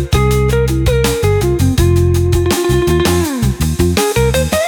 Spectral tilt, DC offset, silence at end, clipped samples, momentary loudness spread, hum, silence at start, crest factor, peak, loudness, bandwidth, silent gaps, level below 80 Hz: -5.5 dB/octave; under 0.1%; 0 s; under 0.1%; 2 LU; none; 0 s; 12 dB; 0 dBFS; -13 LUFS; 20 kHz; none; -20 dBFS